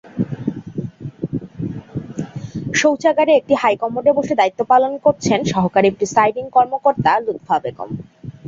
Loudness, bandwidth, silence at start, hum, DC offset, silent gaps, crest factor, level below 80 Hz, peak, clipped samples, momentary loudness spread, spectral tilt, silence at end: -17 LUFS; 7.8 kHz; 0.05 s; none; under 0.1%; none; 16 dB; -50 dBFS; -2 dBFS; under 0.1%; 14 LU; -5.5 dB/octave; 0 s